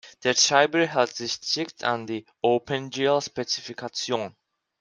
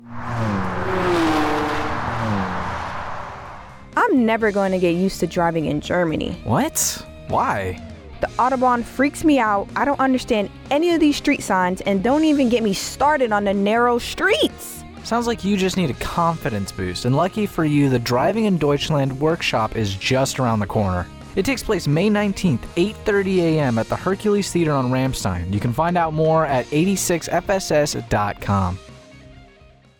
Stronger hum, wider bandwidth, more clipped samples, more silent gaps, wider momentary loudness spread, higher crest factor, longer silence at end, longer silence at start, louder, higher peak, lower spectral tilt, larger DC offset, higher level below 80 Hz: neither; second, 11 kHz vs 19 kHz; neither; neither; first, 11 LU vs 8 LU; first, 22 dB vs 14 dB; about the same, 0.5 s vs 0.55 s; about the same, 0.05 s vs 0 s; second, -24 LUFS vs -20 LUFS; first, -2 dBFS vs -6 dBFS; second, -2.5 dB/octave vs -5 dB/octave; neither; second, -68 dBFS vs -42 dBFS